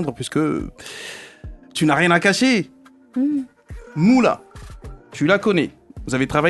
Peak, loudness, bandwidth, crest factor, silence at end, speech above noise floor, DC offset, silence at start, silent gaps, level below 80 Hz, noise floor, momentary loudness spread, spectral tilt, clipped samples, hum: -2 dBFS; -19 LUFS; 12.5 kHz; 18 dB; 0 s; 20 dB; under 0.1%; 0 s; none; -44 dBFS; -39 dBFS; 21 LU; -5 dB/octave; under 0.1%; none